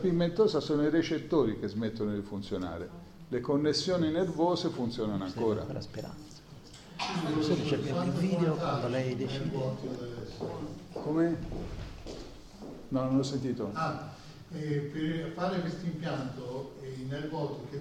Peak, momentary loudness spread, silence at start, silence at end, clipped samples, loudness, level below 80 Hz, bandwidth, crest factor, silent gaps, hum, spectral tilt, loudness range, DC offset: -14 dBFS; 16 LU; 0 s; 0 s; under 0.1%; -32 LUFS; -54 dBFS; 12.5 kHz; 18 dB; none; none; -6.5 dB/octave; 4 LU; under 0.1%